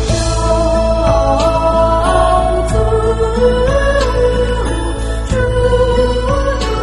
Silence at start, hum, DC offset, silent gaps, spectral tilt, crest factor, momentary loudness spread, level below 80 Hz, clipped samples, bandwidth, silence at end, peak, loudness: 0 s; none; under 0.1%; none; -5.5 dB/octave; 12 dB; 4 LU; -18 dBFS; under 0.1%; 11.5 kHz; 0 s; 0 dBFS; -13 LUFS